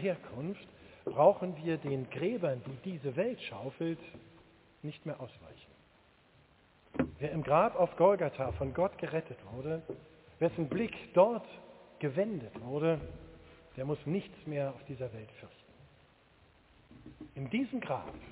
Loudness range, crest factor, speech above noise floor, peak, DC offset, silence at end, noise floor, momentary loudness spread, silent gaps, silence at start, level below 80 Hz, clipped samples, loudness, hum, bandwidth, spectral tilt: 11 LU; 24 dB; 31 dB; -12 dBFS; under 0.1%; 0 s; -65 dBFS; 22 LU; none; 0 s; -60 dBFS; under 0.1%; -34 LUFS; none; 4 kHz; -6.5 dB/octave